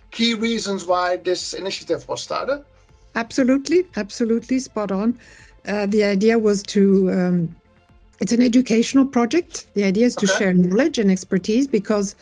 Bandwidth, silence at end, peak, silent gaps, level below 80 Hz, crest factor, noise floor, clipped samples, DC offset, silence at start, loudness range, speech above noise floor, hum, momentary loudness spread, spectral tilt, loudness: 10 kHz; 0.1 s; -6 dBFS; none; -54 dBFS; 14 dB; -52 dBFS; under 0.1%; under 0.1%; 0.1 s; 5 LU; 33 dB; none; 10 LU; -5.5 dB/octave; -20 LUFS